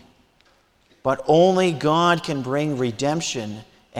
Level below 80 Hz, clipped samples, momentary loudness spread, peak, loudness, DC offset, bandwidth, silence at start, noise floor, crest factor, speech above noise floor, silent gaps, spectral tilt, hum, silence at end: -58 dBFS; under 0.1%; 12 LU; -6 dBFS; -21 LUFS; under 0.1%; 14 kHz; 1.05 s; -60 dBFS; 16 dB; 40 dB; none; -5 dB/octave; none; 0 s